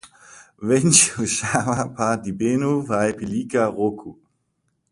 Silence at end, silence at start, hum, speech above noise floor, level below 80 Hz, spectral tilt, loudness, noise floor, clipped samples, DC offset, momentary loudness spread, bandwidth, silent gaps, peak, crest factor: 0.8 s; 0.05 s; none; 51 dB; -54 dBFS; -4 dB/octave; -20 LUFS; -71 dBFS; under 0.1%; under 0.1%; 11 LU; 11.5 kHz; none; 0 dBFS; 22 dB